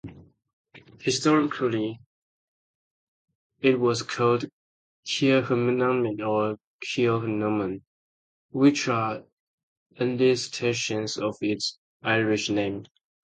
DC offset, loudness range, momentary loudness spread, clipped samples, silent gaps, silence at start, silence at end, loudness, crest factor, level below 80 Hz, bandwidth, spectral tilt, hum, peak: under 0.1%; 3 LU; 11 LU; under 0.1%; 0.53-0.64 s, 2.06-3.28 s, 3.35-3.50 s, 4.53-5.03 s, 6.64-6.79 s, 7.87-8.49 s, 9.33-9.90 s, 11.78-12.00 s; 0.05 s; 0.4 s; -25 LUFS; 20 dB; -64 dBFS; 9.4 kHz; -5 dB/octave; none; -8 dBFS